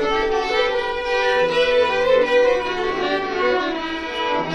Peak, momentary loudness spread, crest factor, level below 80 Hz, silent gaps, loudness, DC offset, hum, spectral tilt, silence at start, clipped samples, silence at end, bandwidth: -6 dBFS; 6 LU; 14 dB; -42 dBFS; none; -19 LUFS; under 0.1%; none; -4 dB/octave; 0 s; under 0.1%; 0 s; 9.2 kHz